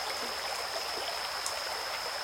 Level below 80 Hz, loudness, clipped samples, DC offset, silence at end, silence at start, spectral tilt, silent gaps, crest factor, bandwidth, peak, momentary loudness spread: -66 dBFS; -34 LUFS; under 0.1%; under 0.1%; 0 s; 0 s; 0.5 dB/octave; none; 24 dB; 16.5 kHz; -10 dBFS; 1 LU